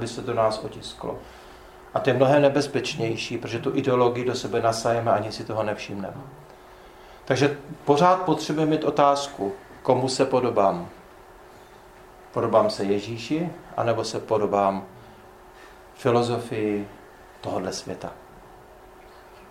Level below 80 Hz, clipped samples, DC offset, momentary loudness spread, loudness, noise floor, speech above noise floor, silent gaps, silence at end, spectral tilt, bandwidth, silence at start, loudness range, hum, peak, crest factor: -56 dBFS; under 0.1%; under 0.1%; 15 LU; -24 LUFS; -48 dBFS; 24 dB; none; 0 s; -5.5 dB/octave; 16 kHz; 0 s; 6 LU; none; -4 dBFS; 22 dB